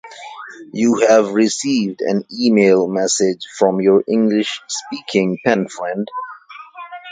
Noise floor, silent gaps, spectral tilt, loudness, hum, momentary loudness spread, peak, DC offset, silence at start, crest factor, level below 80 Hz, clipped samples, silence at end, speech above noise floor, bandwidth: -37 dBFS; none; -4.5 dB/octave; -16 LUFS; none; 20 LU; 0 dBFS; under 0.1%; 0.05 s; 16 dB; -64 dBFS; under 0.1%; 0 s; 21 dB; 9.6 kHz